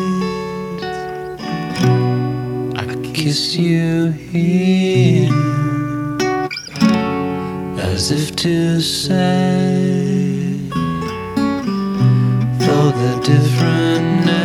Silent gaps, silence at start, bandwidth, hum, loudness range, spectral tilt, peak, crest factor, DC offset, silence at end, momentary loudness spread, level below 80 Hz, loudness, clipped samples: none; 0 s; 14.5 kHz; none; 3 LU; -6 dB/octave; 0 dBFS; 16 dB; under 0.1%; 0 s; 9 LU; -46 dBFS; -17 LUFS; under 0.1%